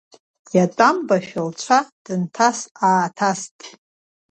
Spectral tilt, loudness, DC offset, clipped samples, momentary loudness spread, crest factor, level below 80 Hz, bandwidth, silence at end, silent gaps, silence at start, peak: -4.5 dB/octave; -19 LUFS; under 0.1%; under 0.1%; 11 LU; 20 dB; -68 dBFS; 8.8 kHz; 0.65 s; 1.92-2.05 s, 2.71-2.75 s, 3.51-3.59 s; 0.55 s; 0 dBFS